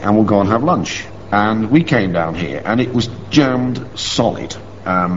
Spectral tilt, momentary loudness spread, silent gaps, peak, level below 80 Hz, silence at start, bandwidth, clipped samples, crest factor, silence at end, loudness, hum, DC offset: -5 dB/octave; 9 LU; none; 0 dBFS; -42 dBFS; 0 s; 8 kHz; under 0.1%; 16 dB; 0 s; -16 LUFS; none; 1%